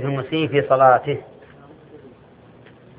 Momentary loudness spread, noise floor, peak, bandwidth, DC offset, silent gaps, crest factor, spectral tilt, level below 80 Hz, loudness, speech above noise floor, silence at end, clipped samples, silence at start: 13 LU; -47 dBFS; -2 dBFS; 4.7 kHz; under 0.1%; none; 20 dB; -11 dB/octave; -60 dBFS; -18 LUFS; 30 dB; 0.9 s; under 0.1%; 0 s